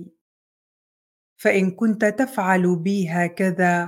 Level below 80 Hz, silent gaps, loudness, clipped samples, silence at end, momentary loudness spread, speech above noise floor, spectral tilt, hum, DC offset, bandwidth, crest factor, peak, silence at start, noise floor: -72 dBFS; 0.21-1.36 s; -21 LUFS; under 0.1%; 0 s; 4 LU; over 70 dB; -7 dB/octave; none; under 0.1%; 16 kHz; 18 dB; -4 dBFS; 0 s; under -90 dBFS